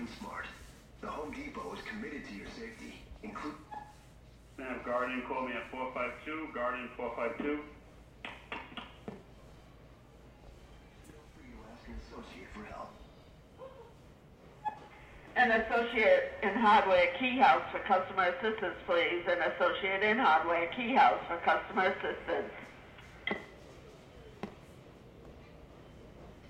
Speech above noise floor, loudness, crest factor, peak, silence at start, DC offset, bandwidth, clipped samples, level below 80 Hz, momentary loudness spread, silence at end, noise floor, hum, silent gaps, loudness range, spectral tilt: 25 dB; -32 LUFS; 22 dB; -12 dBFS; 0 s; under 0.1%; 13 kHz; under 0.1%; -60 dBFS; 26 LU; 0 s; -57 dBFS; none; none; 22 LU; -5 dB/octave